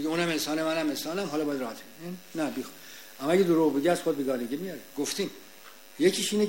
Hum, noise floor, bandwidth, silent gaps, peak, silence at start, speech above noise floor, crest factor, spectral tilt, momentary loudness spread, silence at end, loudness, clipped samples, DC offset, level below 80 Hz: none; -51 dBFS; 16.5 kHz; none; -10 dBFS; 0 s; 23 dB; 18 dB; -4.5 dB/octave; 18 LU; 0 s; -28 LUFS; under 0.1%; 0.2%; -70 dBFS